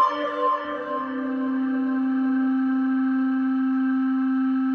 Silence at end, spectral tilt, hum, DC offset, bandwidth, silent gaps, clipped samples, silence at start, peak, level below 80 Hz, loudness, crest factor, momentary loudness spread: 0 s; -6.5 dB/octave; none; under 0.1%; 5.6 kHz; none; under 0.1%; 0 s; -10 dBFS; -72 dBFS; -24 LUFS; 12 dB; 5 LU